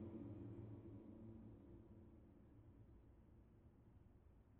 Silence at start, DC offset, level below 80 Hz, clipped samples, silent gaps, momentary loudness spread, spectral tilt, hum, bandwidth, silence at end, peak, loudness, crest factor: 0 s; under 0.1%; -72 dBFS; under 0.1%; none; 14 LU; -10 dB/octave; none; 3.7 kHz; 0 s; -44 dBFS; -61 LUFS; 16 dB